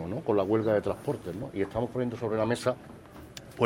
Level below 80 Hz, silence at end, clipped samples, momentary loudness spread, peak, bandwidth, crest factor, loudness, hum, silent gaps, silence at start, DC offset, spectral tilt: -56 dBFS; 0 s; under 0.1%; 19 LU; -10 dBFS; 16 kHz; 20 dB; -30 LUFS; none; none; 0 s; under 0.1%; -7 dB/octave